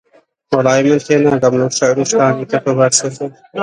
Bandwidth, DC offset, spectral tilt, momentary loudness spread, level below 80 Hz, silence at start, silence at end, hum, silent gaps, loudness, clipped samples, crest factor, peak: 11 kHz; under 0.1%; -4.5 dB/octave; 7 LU; -54 dBFS; 0.5 s; 0 s; none; none; -13 LUFS; under 0.1%; 14 dB; 0 dBFS